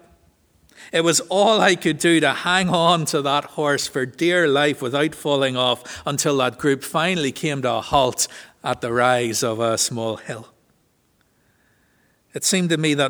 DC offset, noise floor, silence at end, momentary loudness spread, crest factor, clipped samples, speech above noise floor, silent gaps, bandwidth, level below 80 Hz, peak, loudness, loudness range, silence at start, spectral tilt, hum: under 0.1%; -63 dBFS; 0 s; 8 LU; 20 dB; under 0.1%; 43 dB; none; over 20 kHz; -54 dBFS; -2 dBFS; -20 LUFS; 6 LU; 0.8 s; -3.5 dB/octave; none